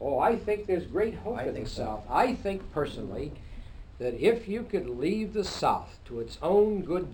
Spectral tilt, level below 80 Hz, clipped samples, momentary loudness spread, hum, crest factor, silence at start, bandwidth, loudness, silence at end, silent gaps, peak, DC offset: -6 dB/octave; -46 dBFS; under 0.1%; 12 LU; none; 20 dB; 0 s; over 20 kHz; -29 LUFS; 0 s; none; -10 dBFS; under 0.1%